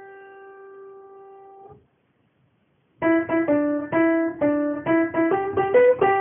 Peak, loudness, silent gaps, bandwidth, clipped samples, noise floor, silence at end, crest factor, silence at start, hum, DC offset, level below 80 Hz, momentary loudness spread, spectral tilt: -6 dBFS; -21 LUFS; none; 3.5 kHz; under 0.1%; -66 dBFS; 0 s; 16 dB; 0 s; none; under 0.1%; -60 dBFS; 8 LU; -1.5 dB/octave